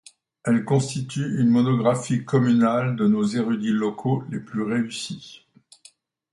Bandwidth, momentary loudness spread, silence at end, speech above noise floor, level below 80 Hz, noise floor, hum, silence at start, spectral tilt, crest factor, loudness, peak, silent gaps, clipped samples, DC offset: 11.5 kHz; 10 LU; 1 s; 33 dB; -64 dBFS; -55 dBFS; none; 0.45 s; -6.5 dB/octave; 16 dB; -23 LUFS; -6 dBFS; none; under 0.1%; under 0.1%